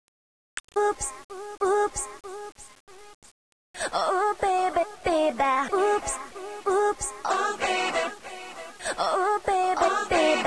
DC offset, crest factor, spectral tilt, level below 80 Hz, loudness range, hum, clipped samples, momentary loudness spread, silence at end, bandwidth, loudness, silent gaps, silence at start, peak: 0.2%; 16 dB; -2.5 dB/octave; -54 dBFS; 5 LU; none; under 0.1%; 16 LU; 0 s; 11 kHz; -26 LUFS; 0.60-0.68 s, 1.24-1.29 s, 2.80-2.87 s, 3.14-3.22 s, 3.31-3.74 s; 0.55 s; -10 dBFS